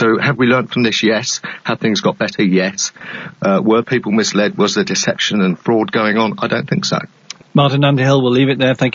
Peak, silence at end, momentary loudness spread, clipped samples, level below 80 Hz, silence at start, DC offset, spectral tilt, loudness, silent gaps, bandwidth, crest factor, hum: 0 dBFS; 0.05 s; 8 LU; under 0.1%; -56 dBFS; 0 s; under 0.1%; -4.5 dB/octave; -15 LUFS; none; 7.6 kHz; 14 dB; none